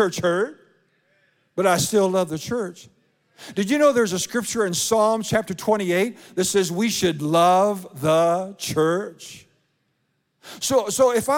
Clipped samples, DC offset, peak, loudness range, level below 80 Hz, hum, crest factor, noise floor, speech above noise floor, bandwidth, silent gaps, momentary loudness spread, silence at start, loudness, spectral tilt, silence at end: under 0.1%; under 0.1%; -6 dBFS; 4 LU; -62 dBFS; none; 16 dB; -71 dBFS; 50 dB; 17.5 kHz; none; 10 LU; 0 s; -21 LUFS; -4 dB/octave; 0 s